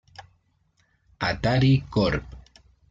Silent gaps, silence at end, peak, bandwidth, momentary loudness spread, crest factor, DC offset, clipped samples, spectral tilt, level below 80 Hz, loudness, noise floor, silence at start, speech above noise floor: none; 0.5 s; -10 dBFS; 7.6 kHz; 10 LU; 16 dB; under 0.1%; under 0.1%; -7.5 dB/octave; -44 dBFS; -23 LUFS; -67 dBFS; 0.2 s; 45 dB